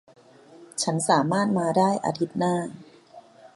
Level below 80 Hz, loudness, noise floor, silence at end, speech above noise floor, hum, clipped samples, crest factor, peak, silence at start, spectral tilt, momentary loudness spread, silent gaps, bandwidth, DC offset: -70 dBFS; -24 LUFS; -50 dBFS; 0.1 s; 27 dB; none; under 0.1%; 20 dB; -6 dBFS; 0.5 s; -5 dB/octave; 8 LU; none; 11.5 kHz; under 0.1%